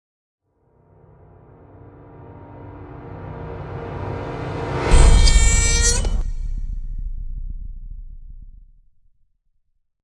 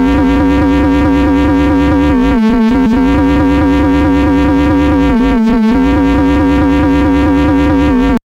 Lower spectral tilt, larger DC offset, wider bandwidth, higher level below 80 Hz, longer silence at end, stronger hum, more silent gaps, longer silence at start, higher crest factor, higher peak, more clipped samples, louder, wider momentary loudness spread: second, -3.5 dB/octave vs -8 dB/octave; neither; first, 11.5 kHz vs 8 kHz; about the same, -22 dBFS vs -18 dBFS; first, 1.55 s vs 0.05 s; neither; neither; first, 2.15 s vs 0 s; first, 20 dB vs 6 dB; about the same, 0 dBFS vs -2 dBFS; neither; second, -20 LUFS vs -10 LUFS; first, 25 LU vs 0 LU